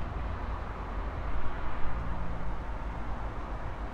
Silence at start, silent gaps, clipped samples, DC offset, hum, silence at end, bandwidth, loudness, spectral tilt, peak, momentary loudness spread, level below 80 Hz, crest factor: 0 s; none; under 0.1%; under 0.1%; none; 0 s; 5.4 kHz; -38 LUFS; -7.5 dB/octave; -16 dBFS; 2 LU; -36 dBFS; 16 dB